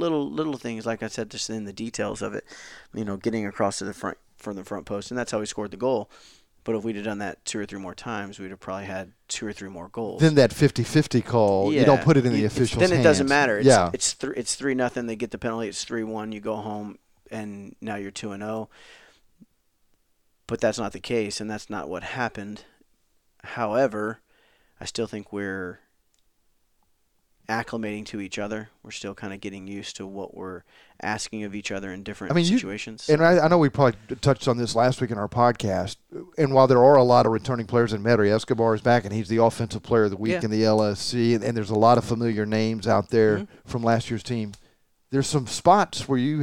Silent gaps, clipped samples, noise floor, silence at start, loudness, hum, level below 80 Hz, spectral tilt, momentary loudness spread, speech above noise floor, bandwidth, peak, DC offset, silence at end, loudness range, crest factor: none; under 0.1%; -69 dBFS; 0 s; -24 LUFS; none; -56 dBFS; -5.5 dB/octave; 17 LU; 45 dB; 16 kHz; -2 dBFS; under 0.1%; 0 s; 14 LU; 22 dB